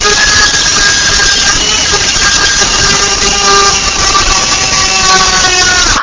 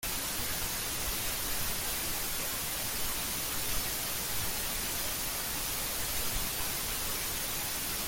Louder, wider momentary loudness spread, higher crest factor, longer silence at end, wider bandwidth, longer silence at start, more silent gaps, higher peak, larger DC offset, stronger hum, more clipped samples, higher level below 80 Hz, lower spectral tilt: first, -6 LUFS vs -32 LUFS; about the same, 2 LU vs 1 LU; second, 8 dB vs 14 dB; about the same, 0 s vs 0 s; second, 8 kHz vs 17 kHz; about the same, 0 s vs 0 s; neither; first, 0 dBFS vs -20 dBFS; neither; neither; first, 0.3% vs under 0.1%; first, -24 dBFS vs -46 dBFS; about the same, -0.5 dB/octave vs -1 dB/octave